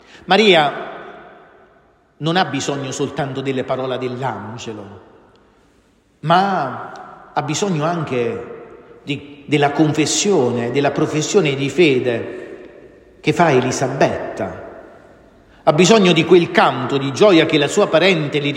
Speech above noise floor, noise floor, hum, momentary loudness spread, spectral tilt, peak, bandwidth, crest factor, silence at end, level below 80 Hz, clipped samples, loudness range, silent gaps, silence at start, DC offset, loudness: 39 dB; -55 dBFS; none; 19 LU; -4.5 dB/octave; 0 dBFS; 12.5 kHz; 18 dB; 0 s; -56 dBFS; under 0.1%; 8 LU; none; 0.3 s; under 0.1%; -16 LUFS